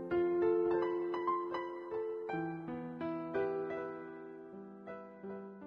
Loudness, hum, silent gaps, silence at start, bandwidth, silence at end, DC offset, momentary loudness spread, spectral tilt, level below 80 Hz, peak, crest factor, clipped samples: -37 LUFS; none; none; 0 s; 5.4 kHz; 0 s; under 0.1%; 17 LU; -9 dB/octave; -72 dBFS; -22 dBFS; 14 dB; under 0.1%